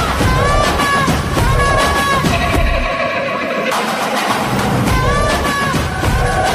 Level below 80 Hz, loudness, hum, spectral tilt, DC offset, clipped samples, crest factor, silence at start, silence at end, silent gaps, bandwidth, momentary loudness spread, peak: -22 dBFS; -15 LUFS; none; -4.5 dB/octave; under 0.1%; under 0.1%; 12 dB; 0 s; 0 s; none; 15.5 kHz; 4 LU; -2 dBFS